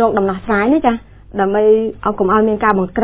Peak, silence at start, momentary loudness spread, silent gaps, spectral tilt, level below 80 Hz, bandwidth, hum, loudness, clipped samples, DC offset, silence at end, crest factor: 0 dBFS; 0 s; 7 LU; none; -11 dB/octave; -40 dBFS; 4 kHz; none; -15 LUFS; under 0.1%; under 0.1%; 0 s; 14 dB